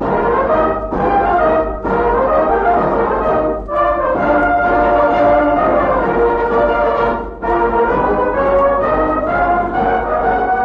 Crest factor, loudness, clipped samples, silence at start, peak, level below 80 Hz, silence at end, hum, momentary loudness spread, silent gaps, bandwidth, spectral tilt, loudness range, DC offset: 12 dB; -14 LUFS; under 0.1%; 0 s; -2 dBFS; -30 dBFS; 0 s; none; 4 LU; none; 6.6 kHz; -8.5 dB/octave; 1 LU; under 0.1%